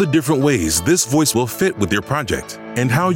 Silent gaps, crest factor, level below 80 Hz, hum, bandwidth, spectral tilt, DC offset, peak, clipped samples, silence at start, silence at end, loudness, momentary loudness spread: none; 12 dB; -42 dBFS; none; 17 kHz; -4.5 dB/octave; under 0.1%; -4 dBFS; under 0.1%; 0 s; 0 s; -17 LUFS; 7 LU